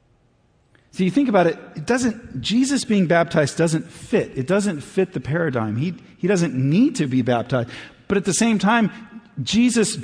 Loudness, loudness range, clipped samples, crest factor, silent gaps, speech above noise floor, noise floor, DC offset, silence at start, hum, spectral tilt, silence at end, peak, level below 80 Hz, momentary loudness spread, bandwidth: -20 LUFS; 2 LU; under 0.1%; 16 dB; none; 40 dB; -60 dBFS; under 0.1%; 0.95 s; none; -5.5 dB/octave; 0 s; -4 dBFS; -54 dBFS; 9 LU; 10.5 kHz